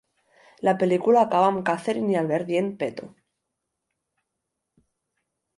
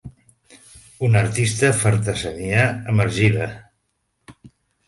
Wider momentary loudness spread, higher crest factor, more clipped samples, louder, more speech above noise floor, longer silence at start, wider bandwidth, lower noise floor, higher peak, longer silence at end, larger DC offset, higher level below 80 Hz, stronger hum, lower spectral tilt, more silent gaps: about the same, 10 LU vs 8 LU; about the same, 18 dB vs 20 dB; neither; second, -23 LUFS vs -19 LUFS; first, 60 dB vs 53 dB; first, 0.65 s vs 0.05 s; about the same, 11.5 kHz vs 11.5 kHz; first, -82 dBFS vs -71 dBFS; second, -8 dBFS vs -2 dBFS; first, 2.5 s vs 0.4 s; neither; second, -72 dBFS vs -46 dBFS; neither; first, -7 dB/octave vs -5 dB/octave; neither